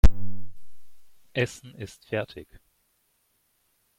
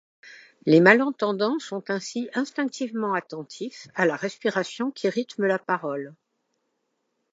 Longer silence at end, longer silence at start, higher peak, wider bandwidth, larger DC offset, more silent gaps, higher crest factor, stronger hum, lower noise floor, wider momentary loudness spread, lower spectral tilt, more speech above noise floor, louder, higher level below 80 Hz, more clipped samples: first, 1.55 s vs 1.2 s; second, 0.05 s vs 0.25 s; about the same, -2 dBFS vs -2 dBFS; first, 16.5 kHz vs 8 kHz; neither; neither; about the same, 22 dB vs 24 dB; neither; second, -70 dBFS vs -76 dBFS; first, 19 LU vs 16 LU; about the same, -6 dB/octave vs -5.5 dB/octave; second, 38 dB vs 52 dB; second, -32 LUFS vs -24 LUFS; first, -30 dBFS vs -80 dBFS; neither